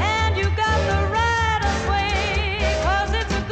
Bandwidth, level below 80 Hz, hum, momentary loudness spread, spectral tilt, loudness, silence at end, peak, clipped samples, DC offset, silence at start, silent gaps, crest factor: 8.8 kHz; -26 dBFS; none; 2 LU; -4.5 dB/octave; -21 LUFS; 0 s; -10 dBFS; under 0.1%; under 0.1%; 0 s; none; 12 dB